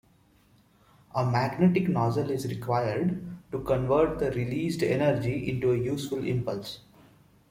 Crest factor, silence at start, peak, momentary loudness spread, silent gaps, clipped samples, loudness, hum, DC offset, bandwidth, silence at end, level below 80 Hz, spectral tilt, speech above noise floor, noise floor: 16 dB; 1.15 s; -12 dBFS; 11 LU; none; under 0.1%; -28 LUFS; none; under 0.1%; 16 kHz; 0.7 s; -52 dBFS; -7.5 dB/octave; 35 dB; -62 dBFS